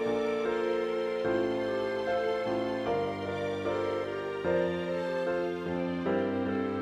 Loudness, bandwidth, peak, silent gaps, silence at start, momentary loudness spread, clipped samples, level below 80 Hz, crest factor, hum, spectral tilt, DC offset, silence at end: -31 LUFS; 11 kHz; -18 dBFS; none; 0 s; 3 LU; under 0.1%; -64 dBFS; 14 dB; none; -6.5 dB/octave; under 0.1%; 0 s